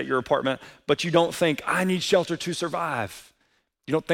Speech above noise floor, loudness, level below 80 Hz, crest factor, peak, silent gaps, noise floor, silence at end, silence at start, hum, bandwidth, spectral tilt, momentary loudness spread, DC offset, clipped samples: 45 dB; -25 LUFS; -62 dBFS; 18 dB; -6 dBFS; none; -69 dBFS; 0 s; 0 s; none; 17 kHz; -4.5 dB/octave; 10 LU; under 0.1%; under 0.1%